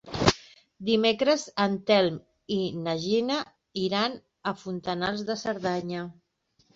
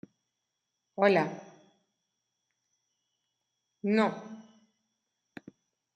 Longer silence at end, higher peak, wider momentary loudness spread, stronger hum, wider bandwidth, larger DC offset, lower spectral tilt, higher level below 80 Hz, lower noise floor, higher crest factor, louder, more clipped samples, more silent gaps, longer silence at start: second, 0.65 s vs 1.55 s; first, -4 dBFS vs -12 dBFS; second, 12 LU vs 26 LU; neither; second, 8 kHz vs 9 kHz; neither; second, -5 dB/octave vs -7 dB/octave; first, -54 dBFS vs -84 dBFS; second, -68 dBFS vs -84 dBFS; about the same, 24 dB vs 24 dB; about the same, -28 LUFS vs -28 LUFS; neither; neither; second, 0.05 s vs 1 s